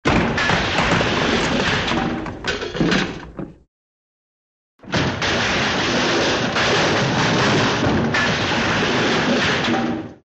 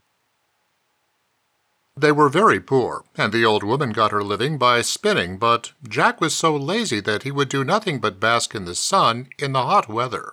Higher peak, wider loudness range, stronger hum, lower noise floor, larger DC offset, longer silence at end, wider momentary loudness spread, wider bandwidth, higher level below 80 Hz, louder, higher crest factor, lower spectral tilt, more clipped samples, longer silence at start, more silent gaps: about the same, -2 dBFS vs -4 dBFS; first, 6 LU vs 2 LU; neither; first, under -90 dBFS vs -69 dBFS; neither; first, 0.15 s vs 0 s; about the same, 8 LU vs 7 LU; second, 8.6 kHz vs 17 kHz; first, -38 dBFS vs -64 dBFS; about the same, -18 LUFS vs -20 LUFS; about the same, 16 dB vs 18 dB; about the same, -4.5 dB/octave vs -4 dB/octave; neither; second, 0.05 s vs 1.95 s; first, 3.68-4.79 s vs none